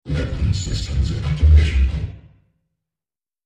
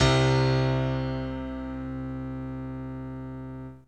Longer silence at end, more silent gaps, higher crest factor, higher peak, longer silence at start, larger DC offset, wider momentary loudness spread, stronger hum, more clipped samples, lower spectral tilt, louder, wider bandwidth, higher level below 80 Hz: first, 1.25 s vs 0.05 s; neither; about the same, 16 dB vs 18 dB; first, -4 dBFS vs -10 dBFS; about the same, 0.05 s vs 0 s; second, under 0.1% vs 0.1%; second, 10 LU vs 15 LU; neither; neither; about the same, -6 dB/octave vs -6 dB/octave; first, -19 LUFS vs -29 LUFS; about the same, 8.4 kHz vs 8.6 kHz; first, -20 dBFS vs -42 dBFS